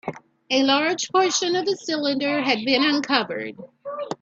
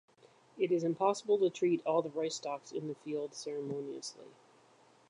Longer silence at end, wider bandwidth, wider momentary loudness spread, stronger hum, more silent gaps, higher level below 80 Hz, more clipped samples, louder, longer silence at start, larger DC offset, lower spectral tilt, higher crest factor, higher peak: second, 0.05 s vs 0.8 s; second, 7.8 kHz vs 10.5 kHz; first, 15 LU vs 11 LU; neither; neither; first, -70 dBFS vs -90 dBFS; neither; first, -21 LUFS vs -35 LUFS; second, 0.05 s vs 0.55 s; neither; second, -2.5 dB/octave vs -5 dB/octave; about the same, 20 dB vs 18 dB; first, -2 dBFS vs -16 dBFS